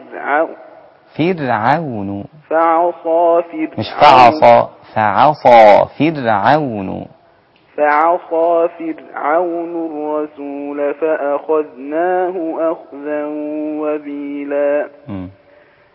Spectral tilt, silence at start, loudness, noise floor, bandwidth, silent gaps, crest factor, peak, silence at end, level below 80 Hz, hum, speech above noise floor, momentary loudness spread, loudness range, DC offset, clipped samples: -7 dB/octave; 0 s; -14 LUFS; -51 dBFS; 8 kHz; none; 14 dB; 0 dBFS; 0.65 s; -52 dBFS; none; 37 dB; 17 LU; 9 LU; under 0.1%; 0.3%